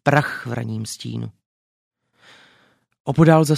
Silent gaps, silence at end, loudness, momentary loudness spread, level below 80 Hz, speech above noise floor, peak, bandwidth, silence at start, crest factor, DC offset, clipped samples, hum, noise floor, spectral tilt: 1.46-1.91 s, 3.00-3.05 s; 0 s; -21 LUFS; 18 LU; -52 dBFS; 41 dB; 0 dBFS; 14.5 kHz; 0.05 s; 20 dB; under 0.1%; under 0.1%; none; -59 dBFS; -6.5 dB/octave